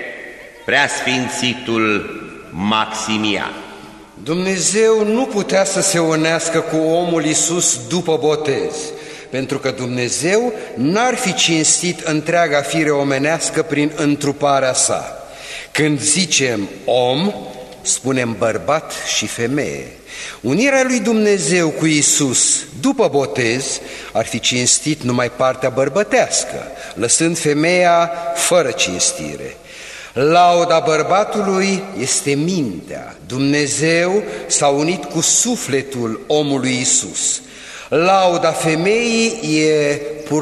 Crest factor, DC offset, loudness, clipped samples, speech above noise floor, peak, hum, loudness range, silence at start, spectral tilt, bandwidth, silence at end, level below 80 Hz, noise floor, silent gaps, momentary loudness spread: 16 dB; under 0.1%; -16 LUFS; under 0.1%; 20 dB; -2 dBFS; none; 3 LU; 0 s; -3 dB/octave; 13.5 kHz; 0 s; -52 dBFS; -37 dBFS; none; 13 LU